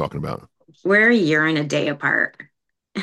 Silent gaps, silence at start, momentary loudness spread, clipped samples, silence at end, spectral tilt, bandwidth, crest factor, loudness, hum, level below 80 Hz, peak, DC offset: none; 0 s; 16 LU; under 0.1%; 0 s; -5.5 dB/octave; 12 kHz; 16 dB; -18 LUFS; none; -56 dBFS; -4 dBFS; under 0.1%